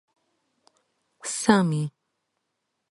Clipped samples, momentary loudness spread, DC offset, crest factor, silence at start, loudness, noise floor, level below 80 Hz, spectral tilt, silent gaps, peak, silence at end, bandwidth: under 0.1%; 14 LU; under 0.1%; 24 dB; 1.25 s; -24 LUFS; -79 dBFS; -66 dBFS; -5 dB/octave; none; -4 dBFS; 1 s; 11.5 kHz